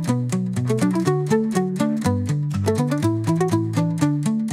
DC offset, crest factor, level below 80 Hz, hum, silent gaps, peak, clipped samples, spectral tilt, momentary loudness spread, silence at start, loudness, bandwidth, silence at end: under 0.1%; 14 dB; -58 dBFS; none; none; -6 dBFS; under 0.1%; -7 dB/octave; 3 LU; 0 s; -21 LUFS; 15.5 kHz; 0 s